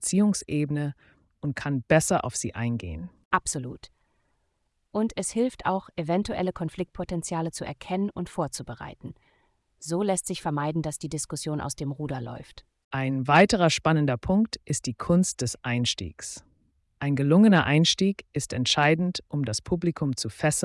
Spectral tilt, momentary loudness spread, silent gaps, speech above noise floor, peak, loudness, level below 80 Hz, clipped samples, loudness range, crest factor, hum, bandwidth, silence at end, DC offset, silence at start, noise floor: -5 dB/octave; 15 LU; 3.25-3.31 s, 12.84-12.91 s; 48 dB; -8 dBFS; -26 LUFS; -52 dBFS; under 0.1%; 8 LU; 18 dB; none; 12 kHz; 0 s; under 0.1%; 0 s; -74 dBFS